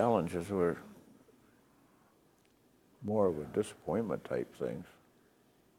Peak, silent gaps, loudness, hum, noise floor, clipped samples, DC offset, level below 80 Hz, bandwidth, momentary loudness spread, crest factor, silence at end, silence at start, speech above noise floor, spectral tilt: -16 dBFS; none; -35 LUFS; none; -68 dBFS; under 0.1%; under 0.1%; -70 dBFS; 16 kHz; 14 LU; 22 dB; 0.9 s; 0 s; 34 dB; -7 dB/octave